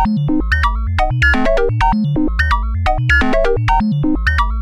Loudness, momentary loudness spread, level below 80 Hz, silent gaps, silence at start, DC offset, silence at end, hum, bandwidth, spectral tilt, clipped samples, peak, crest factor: -15 LUFS; 4 LU; -20 dBFS; none; 0 s; under 0.1%; 0 s; none; 10.5 kHz; -7 dB/octave; under 0.1%; -2 dBFS; 12 dB